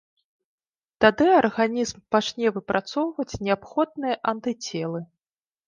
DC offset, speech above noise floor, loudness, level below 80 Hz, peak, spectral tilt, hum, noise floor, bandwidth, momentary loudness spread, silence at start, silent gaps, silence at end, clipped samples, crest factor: under 0.1%; over 67 dB; -24 LUFS; -56 dBFS; -2 dBFS; -4.5 dB/octave; none; under -90 dBFS; 9.8 kHz; 11 LU; 1 s; none; 0.65 s; under 0.1%; 22 dB